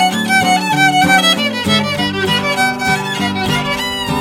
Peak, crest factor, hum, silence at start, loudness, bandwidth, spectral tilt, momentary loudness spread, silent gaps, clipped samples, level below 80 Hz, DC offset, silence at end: 0 dBFS; 14 dB; none; 0 s; -13 LUFS; 17 kHz; -3.5 dB/octave; 7 LU; none; under 0.1%; -42 dBFS; under 0.1%; 0 s